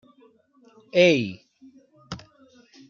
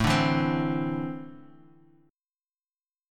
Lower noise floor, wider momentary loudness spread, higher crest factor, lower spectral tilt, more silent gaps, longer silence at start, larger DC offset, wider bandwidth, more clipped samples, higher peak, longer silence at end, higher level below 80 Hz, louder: second, -58 dBFS vs under -90 dBFS; first, 22 LU vs 16 LU; about the same, 22 dB vs 18 dB; about the same, -5 dB/octave vs -6 dB/octave; neither; first, 0.95 s vs 0 s; neither; second, 7.2 kHz vs 15.5 kHz; neither; first, -6 dBFS vs -12 dBFS; second, 0.75 s vs 1.65 s; second, -64 dBFS vs -50 dBFS; first, -21 LUFS vs -27 LUFS